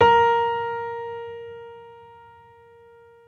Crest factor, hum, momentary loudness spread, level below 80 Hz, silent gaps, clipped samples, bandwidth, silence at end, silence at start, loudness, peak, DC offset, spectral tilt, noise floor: 20 dB; none; 25 LU; -60 dBFS; none; under 0.1%; 6.8 kHz; 1.3 s; 0 s; -23 LUFS; -4 dBFS; under 0.1%; -5 dB/octave; -50 dBFS